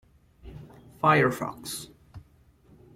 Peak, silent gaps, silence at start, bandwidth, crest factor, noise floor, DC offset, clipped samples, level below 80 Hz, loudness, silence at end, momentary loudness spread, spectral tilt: -8 dBFS; none; 0.45 s; 16.5 kHz; 22 dB; -59 dBFS; under 0.1%; under 0.1%; -56 dBFS; -26 LUFS; 0.75 s; 26 LU; -5 dB/octave